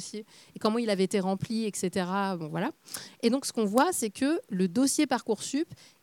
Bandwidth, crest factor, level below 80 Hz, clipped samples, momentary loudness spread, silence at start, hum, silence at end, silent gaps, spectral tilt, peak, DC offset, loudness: 18.5 kHz; 24 dB; -72 dBFS; under 0.1%; 11 LU; 0 s; none; 0.3 s; none; -4.5 dB/octave; -6 dBFS; under 0.1%; -29 LUFS